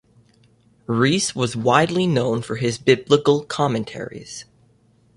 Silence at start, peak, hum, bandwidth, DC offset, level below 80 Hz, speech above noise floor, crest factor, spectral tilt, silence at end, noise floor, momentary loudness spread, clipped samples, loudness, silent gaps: 0.9 s; -2 dBFS; none; 11.5 kHz; under 0.1%; -56 dBFS; 38 dB; 20 dB; -5 dB/octave; 0.75 s; -58 dBFS; 16 LU; under 0.1%; -20 LUFS; none